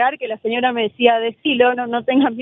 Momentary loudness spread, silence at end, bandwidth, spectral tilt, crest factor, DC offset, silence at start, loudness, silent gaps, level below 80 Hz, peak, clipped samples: 5 LU; 0 s; 3.9 kHz; -7.5 dB/octave; 18 dB; under 0.1%; 0 s; -18 LUFS; none; -64 dBFS; 0 dBFS; under 0.1%